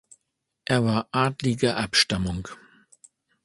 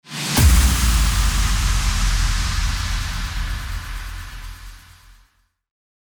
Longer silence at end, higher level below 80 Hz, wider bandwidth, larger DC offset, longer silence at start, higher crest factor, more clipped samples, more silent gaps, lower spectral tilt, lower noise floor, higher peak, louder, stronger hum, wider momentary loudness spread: second, 0.9 s vs 1.3 s; second, -48 dBFS vs -22 dBFS; second, 11.5 kHz vs over 20 kHz; neither; first, 0.7 s vs 0.05 s; about the same, 20 dB vs 16 dB; neither; neither; about the same, -4.5 dB/octave vs -3.5 dB/octave; first, -79 dBFS vs -60 dBFS; about the same, -6 dBFS vs -4 dBFS; second, -24 LUFS vs -20 LUFS; neither; second, 14 LU vs 19 LU